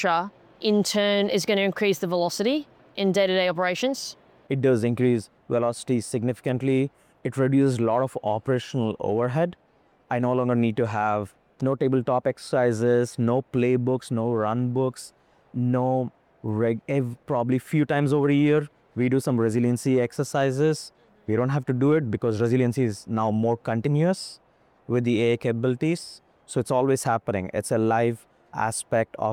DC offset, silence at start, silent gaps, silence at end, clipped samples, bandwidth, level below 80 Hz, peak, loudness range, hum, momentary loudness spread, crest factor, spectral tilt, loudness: under 0.1%; 0 s; none; 0 s; under 0.1%; 16.5 kHz; -64 dBFS; -10 dBFS; 2 LU; none; 8 LU; 14 dB; -6 dB/octave; -24 LUFS